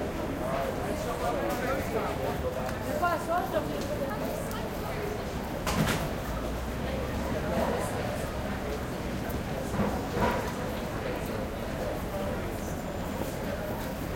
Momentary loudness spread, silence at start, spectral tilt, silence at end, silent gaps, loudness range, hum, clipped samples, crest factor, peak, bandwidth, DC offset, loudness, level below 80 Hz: 5 LU; 0 s; -5.5 dB/octave; 0 s; none; 2 LU; none; under 0.1%; 18 dB; -14 dBFS; 17 kHz; under 0.1%; -32 LUFS; -42 dBFS